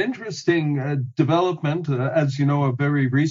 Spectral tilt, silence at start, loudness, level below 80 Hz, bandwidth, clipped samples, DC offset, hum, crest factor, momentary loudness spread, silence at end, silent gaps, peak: -7 dB/octave; 0 s; -22 LUFS; -62 dBFS; 7.6 kHz; under 0.1%; under 0.1%; none; 16 dB; 5 LU; 0 s; none; -6 dBFS